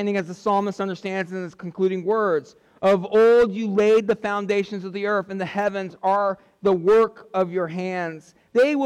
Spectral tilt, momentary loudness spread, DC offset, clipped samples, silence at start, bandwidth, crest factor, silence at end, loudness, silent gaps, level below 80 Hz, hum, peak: -6.5 dB/octave; 10 LU; under 0.1%; under 0.1%; 0 s; 9.8 kHz; 10 dB; 0 s; -22 LUFS; none; -60 dBFS; none; -12 dBFS